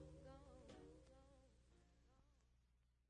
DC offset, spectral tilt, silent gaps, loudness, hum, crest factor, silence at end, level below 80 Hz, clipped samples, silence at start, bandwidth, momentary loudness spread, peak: under 0.1%; -6 dB/octave; none; -64 LUFS; 60 Hz at -75 dBFS; 16 dB; 0 s; -72 dBFS; under 0.1%; 0 s; 9.6 kHz; 4 LU; -50 dBFS